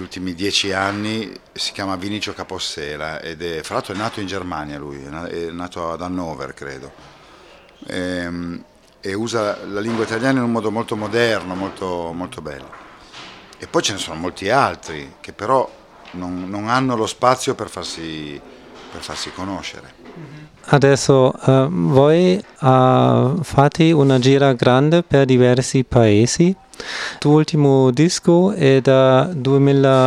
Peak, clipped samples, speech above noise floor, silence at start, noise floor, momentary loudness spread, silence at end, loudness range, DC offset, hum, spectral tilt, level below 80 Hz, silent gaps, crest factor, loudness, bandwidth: 0 dBFS; under 0.1%; 28 dB; 0 s; -45 dBFS; 18 LU; 0 s; 13 LU; under 0.1%; none; -6 dB/octave; -48 dBFS; none; 18 dB; -17 LUFS; 13 kHz